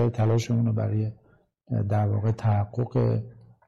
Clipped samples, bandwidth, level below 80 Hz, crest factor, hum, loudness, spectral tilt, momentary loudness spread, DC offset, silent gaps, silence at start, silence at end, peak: under 0.1%; 7.4 kHz; -54 dBFS; 10 dB; none; -26 LUFS; -8.5 dB/octave; 8 LU; under 0.1%; none; 0 s; 0.35 s; -16 dBFS